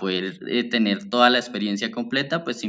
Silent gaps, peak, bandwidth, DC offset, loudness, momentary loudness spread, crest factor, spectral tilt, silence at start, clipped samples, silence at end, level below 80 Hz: none; -2 dBFS; 9.2 kHz; under 0.1%; -22 LUFS; 9 LU; 20 dB; -4.5 dB/octave; 0 s; under 0.1%; 0 s; -74 dBFS